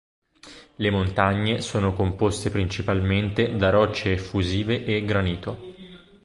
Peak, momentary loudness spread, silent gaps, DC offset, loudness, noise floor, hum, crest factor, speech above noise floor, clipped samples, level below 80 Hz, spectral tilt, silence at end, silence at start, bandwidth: -4 dBFS; 7 LU; none; under 0.1%; -23 LUFS; -48 dBFS; none; 20 dB; 25 dB; under 0.1%; -40 dBFS; -6 dB/octave; 0.3 s; 0.45 s; 11.5 kHz